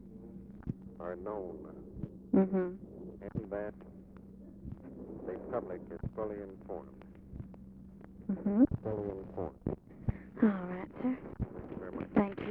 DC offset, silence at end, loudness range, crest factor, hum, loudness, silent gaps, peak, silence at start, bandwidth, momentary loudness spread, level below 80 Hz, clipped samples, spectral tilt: under 0.1%; 0 s; 9 LU; 24 dB; none; -37 LUFS; none; -14 dBFS; 0 s; 3.9 kHz; 20 LU; -54 dBFS; under 0.1%; -11 dB/octave